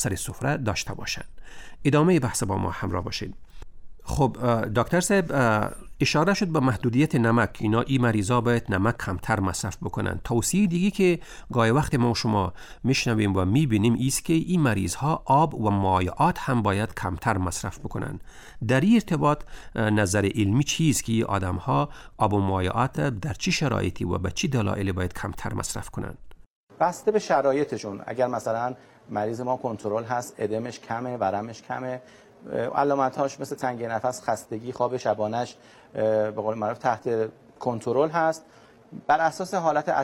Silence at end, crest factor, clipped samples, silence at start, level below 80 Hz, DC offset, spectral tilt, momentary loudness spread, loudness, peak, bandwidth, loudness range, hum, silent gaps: 0 s; 16 dB; under 0.1%; 0 s; -46 dBFS; under 0.1%; -5.5 dB/octave; 10 LU; -25 LUFS; -8 dBFS; 16.5 kHz; 5 LU; none; 26.50-26.67 s